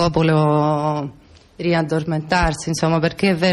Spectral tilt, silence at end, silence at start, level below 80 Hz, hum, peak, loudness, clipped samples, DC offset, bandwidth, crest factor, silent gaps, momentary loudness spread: -6 dB/octave; 0 s; 0 s; -36 dBFS; none; -6 dBFS; -19 LUFS; under 0.1%; under 0.1%; 12 kHz; 12 dB; none; 7 LU